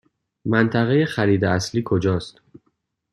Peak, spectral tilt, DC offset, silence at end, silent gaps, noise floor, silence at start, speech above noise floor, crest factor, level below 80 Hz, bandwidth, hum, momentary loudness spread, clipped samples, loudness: -2 dBFS; -6.5 dB/octave; under 0.1%; 0.85 s; none; -70 dBFS; 0.45 s; 51 dB; 20 dB; -54 dBFS; 12 kHz; none; 8 LU; under 0.1%; -20 LUFS